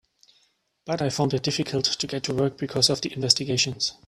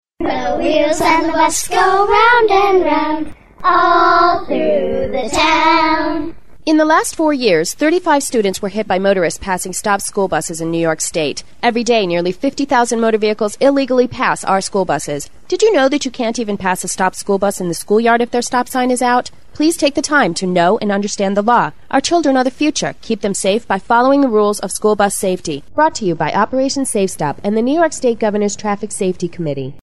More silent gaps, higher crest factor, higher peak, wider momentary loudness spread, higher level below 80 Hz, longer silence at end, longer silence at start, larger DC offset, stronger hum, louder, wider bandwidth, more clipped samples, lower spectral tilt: neither; first, 24 dB vs 14 dB; about the same, -2 dBFS vs -2 dBFS; about the same, 6 LU vs 8 LU; second, -60 dBFS vs -44 dBFS; first, 0.15 s vs 0 s; first, 0.85 s vs 0 s; second, under 0.1% vs 2%; neither; second, -24 LUFS vs -15 LUFS; about the same, 14 kHz vs 13.5 kHz; neither; about the same, -3.5 dB/octave vs -4 dB/octave